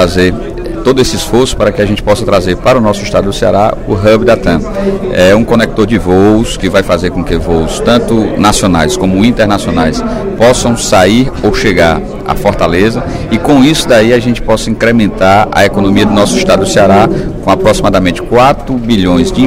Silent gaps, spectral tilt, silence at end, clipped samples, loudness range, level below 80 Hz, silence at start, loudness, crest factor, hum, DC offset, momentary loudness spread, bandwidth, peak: none; -5.5 dB/octave; 0 s; 1%; 2 LU; -22 dBFS; 0 s; -9 LUFS; 8 dB; none; under 0.1%; 6 LU; 16.5 kHz; 0 dBFS